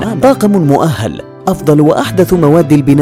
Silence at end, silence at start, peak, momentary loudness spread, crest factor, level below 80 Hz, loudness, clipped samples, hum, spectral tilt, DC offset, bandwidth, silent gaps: 0 s; 0 s; 0 dBFS; 9 LU; 8 dB; -36 dBFS; -10 LUFS; under 0.1%; none; -7.5 dB/octave; under 0.1%; 16 kHz; none